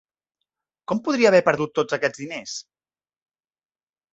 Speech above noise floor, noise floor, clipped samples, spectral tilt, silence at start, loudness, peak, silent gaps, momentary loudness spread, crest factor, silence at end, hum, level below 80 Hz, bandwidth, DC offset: over 69 dB; under -90 dBFS; under 0.1%; -4.5 dB/octave; 0.9 s; -21 LUFS; -2 dBFS; none; 17 LU; 22 dB; 1.55 s; none; -66 dBFS; 8 kHz; under 0.1%